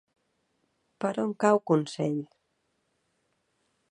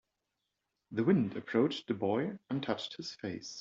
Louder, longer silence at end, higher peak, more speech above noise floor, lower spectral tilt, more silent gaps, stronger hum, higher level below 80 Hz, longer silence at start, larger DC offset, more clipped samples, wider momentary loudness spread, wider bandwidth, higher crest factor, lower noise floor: first, -28 LUFS vs -34 LUFS; first, 1.65 s vs 0 s; first, -8 dBFS vs -16 dBFS; about the same, 50 dB vs 52 dB; about the same, -6.5 dB/octave vs -6 dB/octave; neither; neither; about the same, -78 dBFS vs -76 dBFS; about the same, 1 s vs 0.9 s; neither; neither; about the same, 11 LU vs 11 LU; first, 10.5 kHz vs 7.8 kHz; about the same, 22 dB vs 18 dB; second, -76 dBFS vs -86 dBFS